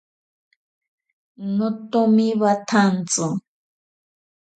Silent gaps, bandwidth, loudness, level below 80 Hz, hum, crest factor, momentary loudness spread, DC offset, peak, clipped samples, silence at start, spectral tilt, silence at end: none; 9.4 kHz; -20 LUFS; -70 dBFS; none; 18 dB; 9 LU; under 0.1%; -6 dBFS; under 0.1%; 1.4 s; -5 dB/octave; 1.2 s